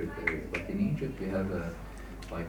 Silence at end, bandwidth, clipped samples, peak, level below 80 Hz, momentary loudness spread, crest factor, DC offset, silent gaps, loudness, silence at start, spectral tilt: 0 s; 19.5 kHz; under 0.1%; -12 dBFS; -46 dBFS; 12 LU; 22 dB; under 0.1%; none; -34 LUFS; 0 s; -7.5 dB/octave